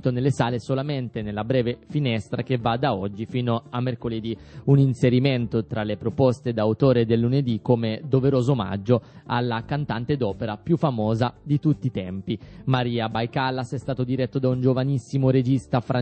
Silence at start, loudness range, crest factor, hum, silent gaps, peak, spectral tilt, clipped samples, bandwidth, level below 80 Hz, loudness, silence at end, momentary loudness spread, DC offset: 0.05 s; 4 LU; 18 dB; none; none; -4 dBFS; -8 dB/octave; under 0.1%; 8.4 kHz; -52 dBFS; -24 LUFS; 0 s; 8 LU; under 0.1%